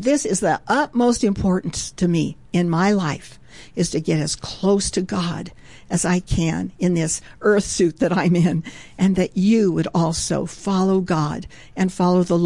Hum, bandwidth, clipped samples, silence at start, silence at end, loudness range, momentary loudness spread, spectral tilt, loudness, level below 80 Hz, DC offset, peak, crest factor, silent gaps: none; 11.5 kHz; under 0.1%; 0 s; 0 s; 3 LU; 8 LU; -5.5 dB/octave; -20 LUFS; -42 dBFS; 0.4%; -8 dBFS; 12 dB; none